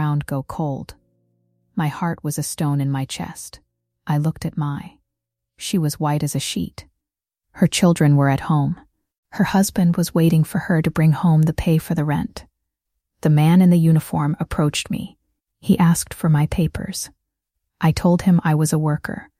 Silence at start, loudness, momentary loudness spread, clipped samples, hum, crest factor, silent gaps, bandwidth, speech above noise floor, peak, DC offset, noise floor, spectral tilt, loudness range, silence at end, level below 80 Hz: 0 s; -19 LUFS; 15 LU; under 0.1%; none; 16 dB; 9.18-9.23 s; 15.5 kHz; 66 dB; -4 dBFS; under 0.1%; -84 dBFS; -6 dB/octave; 7 LU; 0.15 s; -44 dBFS